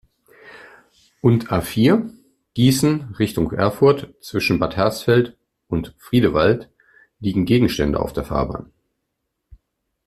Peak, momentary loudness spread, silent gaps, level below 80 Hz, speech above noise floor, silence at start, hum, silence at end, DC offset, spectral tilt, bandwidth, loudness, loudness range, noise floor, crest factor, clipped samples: -2 dBFS; 11 LU; none; -42 dBFS; 58 dB; 0.45 s; none; 1.4 s; under 0.1%; -6.5 dB/octave; 14.5 kHz; -19 LUFS; 3 LU; -76 dBFS; 18 dB; under 0.1%